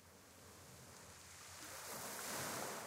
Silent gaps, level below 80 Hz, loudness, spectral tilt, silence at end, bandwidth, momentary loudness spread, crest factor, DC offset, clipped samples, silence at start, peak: none; -76 dBFS; -49 LUFS; -2 dB/octave; 0 s; 16 kHz; 16 LU; 20 dB; under 0.1%; under 0.1%; 0 s; -32 dBFS